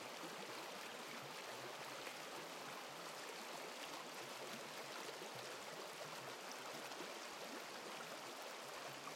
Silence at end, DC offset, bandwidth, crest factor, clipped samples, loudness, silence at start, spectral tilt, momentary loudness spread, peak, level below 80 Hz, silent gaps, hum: 0 s; under 0.1%; 16.5 kHz; 16 dB; under 0.1%; -50 LUFS; 0 s; -2 dB/octave; 1 LU; -34 dBFS; under -90 dBFS; none; none